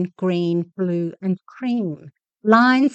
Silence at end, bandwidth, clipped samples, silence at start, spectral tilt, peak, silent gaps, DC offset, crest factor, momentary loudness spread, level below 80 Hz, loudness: 0 s; 8 kHz; under 0.1%; 0 s; -7.5 dB/octave; -2 dBFS; none; under 0.1%; 18 dB; 12 LU; -74 dBFS; -20 LUFS